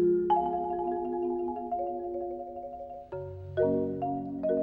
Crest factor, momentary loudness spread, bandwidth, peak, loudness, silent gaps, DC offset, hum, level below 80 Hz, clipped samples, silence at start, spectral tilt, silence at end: 16 dB; 13 LU; 3.5 kHz; -16 dBFS; -32 LUFS; none; under 0.1%; none; -60 dBFS; under 0.1%; 0 s; -10.5 dB/octave; 0 s